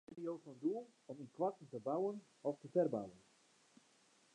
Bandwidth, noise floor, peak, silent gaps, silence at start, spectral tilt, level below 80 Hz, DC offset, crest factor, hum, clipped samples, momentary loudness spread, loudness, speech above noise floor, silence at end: 10.5 kHz; -72 dBFS; -24 dBFS; none; 0.1 s; -8 dB/octave; -88 dBFS; under 0.1%; 20 dB; none; under 0.1%; 16 LU; -42 LUFS; 30 dB; 1.15 s